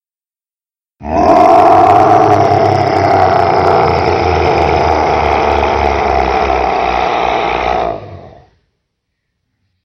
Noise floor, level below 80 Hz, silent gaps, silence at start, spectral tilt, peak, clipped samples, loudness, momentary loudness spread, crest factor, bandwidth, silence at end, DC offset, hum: under -90 dBFS; -28 dBFS; none; 1 s; -6.5 dB/octave; 0 dBFS; 0.4%; -10 LUFS; 7 LU; 12 dB; 8.2 kHz; 1.55 s; under 0.1%; none